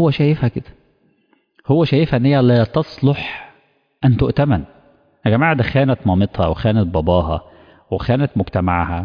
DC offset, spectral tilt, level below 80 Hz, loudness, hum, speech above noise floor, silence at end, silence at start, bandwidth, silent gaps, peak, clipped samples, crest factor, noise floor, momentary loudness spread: under 0.1%; -10 dB/octave; -36 dBFS; -17 LUFS; none; 45 dB; 0 s; 0 s; 5.2 kHz; none; -4 dBFS; under 0.1%; 14 dB; -60 dBFS; 9 LU